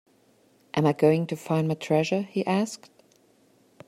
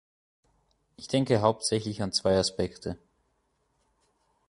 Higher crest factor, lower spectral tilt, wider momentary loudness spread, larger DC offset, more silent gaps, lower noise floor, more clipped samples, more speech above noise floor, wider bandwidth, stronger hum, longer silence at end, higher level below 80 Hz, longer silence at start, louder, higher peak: about the same, 18 dB vs 22 dB; first, -6.5 dB/octave vs -4.5 dB/octave; second, 9 LU vs 15 LU; neither; neither; second, -62 dBFS vs -74 dBFS; neither; second, 37 dB vs 46 dB; first, 14.5 kHz vs 11.5 kHz; neither; second, 1.1 s vs 1.55 s; second, -70 dBFS vs -54 dBFS; second, 0.75 s vs 1 s; about the same, -25 LUFS vs -27 LUFS; about the same, -8 dBFS vs -8 dBFS